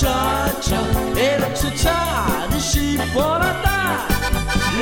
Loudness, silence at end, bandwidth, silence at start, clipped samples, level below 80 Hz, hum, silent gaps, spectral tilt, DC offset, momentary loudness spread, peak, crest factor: -19 LUFS; 0 s; 17 kHz; 0 s; under 0.1%; -26 dBFS; none; none; -4 dB/octave; under 0.1%; 2 LU; -4 dBFS; 14 dB